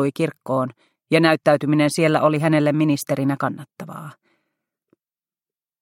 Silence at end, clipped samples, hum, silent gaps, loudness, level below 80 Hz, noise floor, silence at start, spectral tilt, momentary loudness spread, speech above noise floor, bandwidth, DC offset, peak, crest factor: 1.7 s; under 0.1%; none; none; -19 LUFS; -66 dBFS; under -90 dBFS; 0 s; -6 dB/octave; 18 LU; over 71 dB; 16 kHz; under 0.1%; -2 dBFS; 20 dB